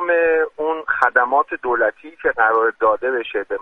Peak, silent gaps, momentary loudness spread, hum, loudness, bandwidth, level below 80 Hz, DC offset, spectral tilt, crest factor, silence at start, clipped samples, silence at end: 0 dBFS; none; 7 LU; none; -18 LUFS; 6.2 kHz; -58 dBFS; under 0.1%; -5 dB/octave; 18 dB; 0 s; under 0.1%; 0 s